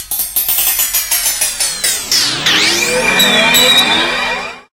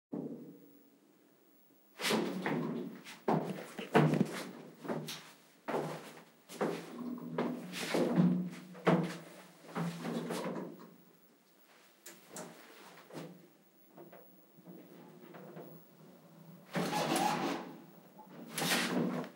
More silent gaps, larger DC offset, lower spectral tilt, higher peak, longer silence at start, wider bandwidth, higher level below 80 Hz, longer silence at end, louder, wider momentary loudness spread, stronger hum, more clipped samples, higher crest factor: neither; neither; second, 0 dB/octave vs -5 dB/octave; first, 0 dBFS vs -14 dBFS; about the same, 0 s vs 0.1 s; about the same, 17.5 kHz vs 16 kHz; first, -42 dBFS vs -86 dBFS; first, 0.15 s vs 0 s; first, -10 LUFS vs -36 LUFS; second, 7 LU vs 24 LU; neither; neither; second, 14 dB vs 24 dB